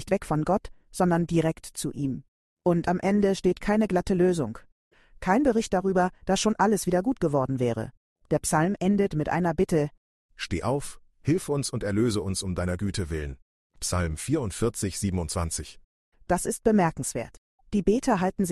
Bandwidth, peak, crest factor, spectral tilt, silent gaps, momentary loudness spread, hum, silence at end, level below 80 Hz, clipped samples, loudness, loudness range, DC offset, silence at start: 12.5 kHz; -8 dBFS; 18 dB; -5.5 dB/octave; 2.28-2.57 s, 4.72-4.91 s, 7.97-8.16 s, 9.98-10.29 s, 13.42-13.70 s, 15.84-16.12 s, 17.38-17.58 s; 10 LU; none; 0 s; -46 dBFS; under 0.1%; -26 LUFS; 4 LU; under 0.1%; 0 s